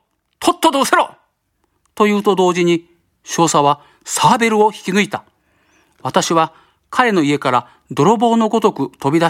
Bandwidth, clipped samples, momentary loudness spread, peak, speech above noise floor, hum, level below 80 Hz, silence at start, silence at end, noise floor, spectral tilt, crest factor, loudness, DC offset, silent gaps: 16.5 kHz; under 0.1%; 9 LU; 0 dBFS; 51 dB; none; -60 dBFS; 0.4 s; 0 s; -66 dBFS; -4.5 dB/octave; 16 dB; -15 LUFS; under 0.1%; none